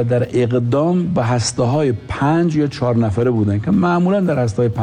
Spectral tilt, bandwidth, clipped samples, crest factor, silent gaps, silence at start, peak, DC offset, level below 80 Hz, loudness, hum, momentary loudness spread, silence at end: -7 dB/octave; 10 kHz; under 0.1%; 8 dB; none; 0 s; -8 dBFS; under 0.1%; -44 dBFS; -17 LUFS; none; 3 LU; 0 s